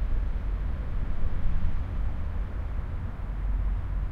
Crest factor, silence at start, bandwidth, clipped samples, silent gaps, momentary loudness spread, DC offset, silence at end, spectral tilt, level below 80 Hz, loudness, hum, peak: 14 dB; 0 s; 3.8 kHz; under 0.1%; none; 3 LU; under 0.1%; 0 s; -9 dB/octave; -28 dBFS; -34 LUFS; none; -12 dBFS